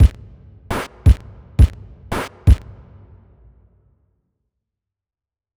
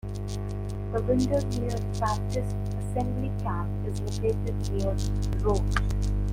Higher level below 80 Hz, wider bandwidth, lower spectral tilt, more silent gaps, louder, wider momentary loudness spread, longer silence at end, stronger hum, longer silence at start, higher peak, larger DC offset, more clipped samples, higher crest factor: first, -22 dBFS vs -32 dBFS; second, 12.5 kHz vs 15.5 kHz; about the same, -7 dB/octave vs -7 dB/octave; neither; first, -19 LUFS vs -29 LUFS; first, 11 LU vs 6 LU; first, 3 s vs 0 s; second, none vs 50 Hz at -30 dBFS; about the same, 0 s vs 0.05 s; first, -2 dBFS vs -10 dBFS; neither; neither; about the same, 18 dB vs 18 dB